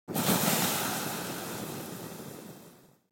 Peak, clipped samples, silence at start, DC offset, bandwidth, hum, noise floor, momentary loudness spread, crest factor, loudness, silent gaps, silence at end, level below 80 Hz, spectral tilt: -12 dBFS; under 0.1%; 0.1 s; under 0.1%; 17 kHz; none; -56 dBFS; 20 LU; 22 dB; -30 LUFS; none; 0.35 s; -70 dBFS; -3 dB/octave